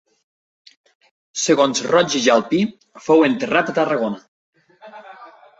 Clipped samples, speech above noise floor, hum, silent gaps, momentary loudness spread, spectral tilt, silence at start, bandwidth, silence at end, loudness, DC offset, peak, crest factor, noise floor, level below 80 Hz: under 0.1%; 26 dB; none; 4.28-4.53 s; 17 LU; -3.5 dB/octave; 1.35 s; 8.2 kHz; 0.35 s; -17 LUFS; under 0.1%; -2 dBFS; 18 dB; -43 dBFS; -64 dBFS